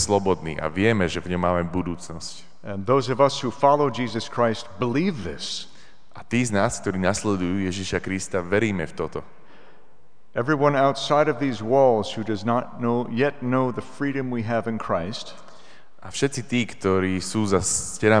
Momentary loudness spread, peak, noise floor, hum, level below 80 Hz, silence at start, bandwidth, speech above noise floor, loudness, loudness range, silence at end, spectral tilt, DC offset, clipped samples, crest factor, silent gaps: 12 LU; -2 dBFS; -60 dBFS; none; -52 dBFS; 0 s; 10 kHz; 36 dB; -24 LUFS; 5 LU; 0 s; -5 dB/octave; 1%; under 0.1%; 20 dB; none